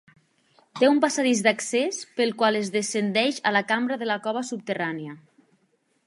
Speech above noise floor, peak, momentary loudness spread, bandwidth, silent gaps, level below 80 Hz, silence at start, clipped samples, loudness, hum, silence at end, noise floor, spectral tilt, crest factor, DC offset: 45 dB; -4 dBFS; 9 LU; 11.5 kHz; none; -78 dBFS; 0.75 s; under 0.1%; -24 LUFS; none; 0.9 s; -69 dBFS; -3.5 dB/octave; 22 dB; under 0.1%